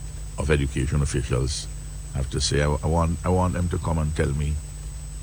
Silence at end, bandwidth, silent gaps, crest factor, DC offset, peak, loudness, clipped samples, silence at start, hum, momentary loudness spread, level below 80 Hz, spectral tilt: 0 s; over 20 kHz; none; 16 dB; under 0.1%; -8 dBFS; -25 LUFS; under 0.1%; 0 s; none; 13 LU; -30 dBFS; -5.5 dB/octave